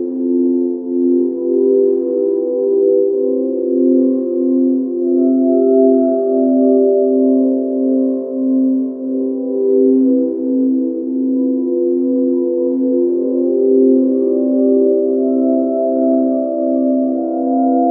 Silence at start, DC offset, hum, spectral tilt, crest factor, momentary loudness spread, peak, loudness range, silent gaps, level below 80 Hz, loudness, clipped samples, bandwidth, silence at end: 0 s; under 0.1%; none; -13 dB/octave; 12 dB; 5 LU; -2 dBFS; 2 LU; none; -72 dBFS; -14 LUFS; under 0.1%; 1.4 kHz; 0 s